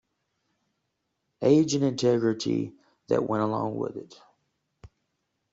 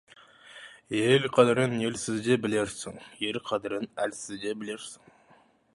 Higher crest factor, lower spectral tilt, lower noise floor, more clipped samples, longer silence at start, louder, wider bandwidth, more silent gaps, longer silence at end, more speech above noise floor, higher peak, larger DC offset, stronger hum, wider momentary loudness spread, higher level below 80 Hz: about the same, 20 dB vs 22 dB; first, -6 dB/octave vs -4.5 dB/octave; first, -79 dBFS vs -61 dBFS; neither; first, 1.4 s vs 0.5 s; about the same, -26 LUFS vs -28 LUFS; second, 8 kHz vs 11.5 kHz; neither; second, 0.65 s vs 0.8 s; first, 54 dB vs 33 dB; about the same, -8 dBFS vs -6 dBFS; neither; neither; second, 12 LU vs 19 LU; about the same, -66 dBFS vs -66 dBFS